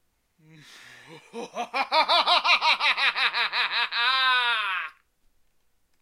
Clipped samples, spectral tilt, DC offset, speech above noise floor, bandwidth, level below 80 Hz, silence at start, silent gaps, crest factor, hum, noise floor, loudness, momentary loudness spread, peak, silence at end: under 0.1%; -0.5 dB/octave; under 0.1%; 40 dB; 15.5 kHz; -74 dBFS; 0.7 s; none; 20 dB; none; -66 dBFS; -22 LUFS; 16 LU; -6 dBFS; 1.1 s